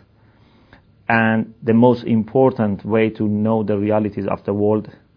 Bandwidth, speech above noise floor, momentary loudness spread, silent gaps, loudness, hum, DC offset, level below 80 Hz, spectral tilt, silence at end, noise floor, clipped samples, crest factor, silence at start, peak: 5.2 kHz; 35 dB; 7 LU; none; -18 LUFS; none; under 0.1%; -56 dBFS; -10.5 dB/octave; 0.25 s; -52 dBFS; under 0.1%; 18 dB; 1.1 s; 0 dBFS